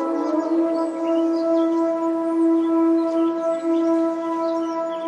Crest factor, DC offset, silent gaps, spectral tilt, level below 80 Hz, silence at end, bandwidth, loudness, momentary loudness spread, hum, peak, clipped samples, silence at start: 10 dB; under 0.1%; none; -5.5 dB/octave; -90 dBFS; 0 s; 8.4 kHz; -21 LUFS; 5 LU; none; -10 dBFS; under 0.1%; 0 s